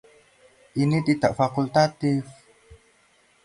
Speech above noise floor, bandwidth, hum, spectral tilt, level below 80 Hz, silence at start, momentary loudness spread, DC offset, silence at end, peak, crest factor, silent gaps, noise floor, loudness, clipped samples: 39 dB; 11 kHz; none; -7 dB/octave; -58 dBFS; 0.75 s; 8 LU; under 0.1%; 0.7 s; -6 dBFS; 20 dB; none; -61 dBFS; -23 LUFS; under 0.1%